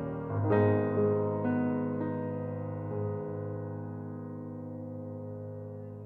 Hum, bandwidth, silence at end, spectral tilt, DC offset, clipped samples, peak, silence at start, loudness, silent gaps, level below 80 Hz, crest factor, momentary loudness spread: none; 4 kHz; 0 s; -12 dB/octave; under 0.1%; under 0.1%; -14 dBFS; 0 s; -33 LUFS; none; -64 dBFS; 20 dB; 14 LU